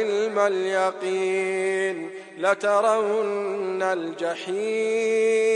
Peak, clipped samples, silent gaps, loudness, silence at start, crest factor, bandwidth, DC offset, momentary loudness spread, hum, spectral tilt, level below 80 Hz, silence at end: -6 dBFS; under 0.1%; none; -24 LUFS; 0 s; 16 dB; 11 kHz; under 0.1%; 7 LU; none; -4 dB/octave; -86 dBFS; 0 s